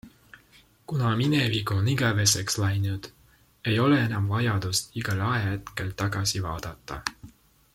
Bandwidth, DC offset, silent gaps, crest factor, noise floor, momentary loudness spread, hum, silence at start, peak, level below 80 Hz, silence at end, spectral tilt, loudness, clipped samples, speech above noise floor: 16.5 kHz; under 0.1%; none; 20 dB; -58 dBFS; 12 LU; none; 0.05 s; -6 dBFS; -52 dBFS; 0.45 s; -4.5 dB/octave; -26 LUFS; under 0.1%; 32 dB